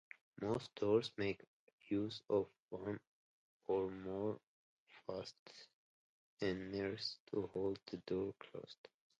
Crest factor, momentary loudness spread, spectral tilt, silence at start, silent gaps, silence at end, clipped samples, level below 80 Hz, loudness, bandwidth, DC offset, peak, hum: 20 dB; 15 LU; -6.5 dB/octave; 0.35 s; 1.47-1.67 s, 1.73-1.78 s, 2.59-2.69 s, 3.07-3.60 s, 4.43-4.87 s, 5.39-5.46 s, 5.73-6.37 s, 7.20-7.27 s; 0.45 s; under 0.1%; -72 dBFS; -43 LUFS; 10 kHz; under 0.1%; -22 dBFS; none